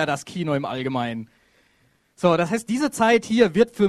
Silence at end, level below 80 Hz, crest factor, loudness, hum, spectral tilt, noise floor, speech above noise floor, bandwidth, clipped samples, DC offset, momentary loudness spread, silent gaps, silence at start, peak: 0 s; -58 dBFS; 18 dB; -22 LUFS; none; -5.5 dB/octave; -63 dBFS; 42 dB; 13.5 kHz; under 0.1%; under 0.1%; 9 LU; none; 0 s; -4 dBFS